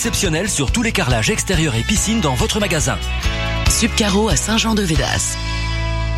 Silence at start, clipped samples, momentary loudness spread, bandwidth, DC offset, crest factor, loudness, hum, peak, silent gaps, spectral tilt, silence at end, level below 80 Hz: 0 s; under 0.1%; 6 LU; 16 kHz; under 0.1%; 16 dB; -17 LUFS; none; -2 dBFS; none; -3.5 dB/octave; 0 s; -24 dBFS